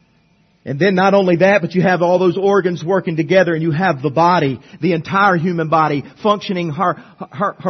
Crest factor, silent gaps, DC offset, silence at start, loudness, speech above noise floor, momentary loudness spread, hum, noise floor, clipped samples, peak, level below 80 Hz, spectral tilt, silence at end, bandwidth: 16 dB; none; under 0.1%; 0.65 s; -15 LUFS; 41 dB; 9 LU; none; -56 dBFS; under 0.1%; 0 dBFS; -58 dBFS; -7 dB/octave; 0 s; 6.4 kHz